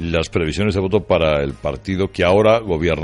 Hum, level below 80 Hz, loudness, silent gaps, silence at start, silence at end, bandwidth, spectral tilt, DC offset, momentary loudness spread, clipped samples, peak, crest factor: none; -36 dBFS; -18 LUFS; none; 0 s; 0 s; 11.5 kHz; -6.5 dB/octave; under 0.1%; 8 LU; under 0.1%; -2 dBFS; 14 dB